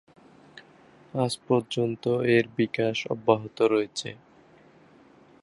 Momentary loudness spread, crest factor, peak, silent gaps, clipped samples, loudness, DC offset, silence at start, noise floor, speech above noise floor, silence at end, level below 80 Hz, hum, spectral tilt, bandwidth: 9 LU; 22 dB; -6 dBFS; none; under 0.1%; -26 LUFS; under 0.1%; 0.55 s; -56 dBFS; 30 dB; 1.3 s; -68 dBFS; none; -5.5 dB/octave; 11.5 kHz